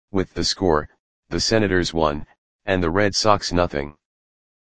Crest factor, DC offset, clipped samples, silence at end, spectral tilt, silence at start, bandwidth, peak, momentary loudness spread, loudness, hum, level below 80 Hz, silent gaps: 22 dB; 1%; under 0.1%; 0.6 s; -4.5 dB/octave; 0.1 s; 10 kHz; 0 dBFS; 13 LU; -21 LUFS; none; -40 dBFS; 0.99-1.23 s, 2.38-2.59 s